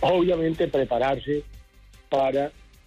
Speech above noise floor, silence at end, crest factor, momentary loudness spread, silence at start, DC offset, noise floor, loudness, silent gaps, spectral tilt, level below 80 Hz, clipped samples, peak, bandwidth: 28 dB; 0.35 s; 12 dB; 8 LU; 0 s; under 0.1%; -51 dBFS; -25 LUFS; none; -7 dB/octave; -48 dBFS; under 0.1%; -12 dBFS; 11 kHz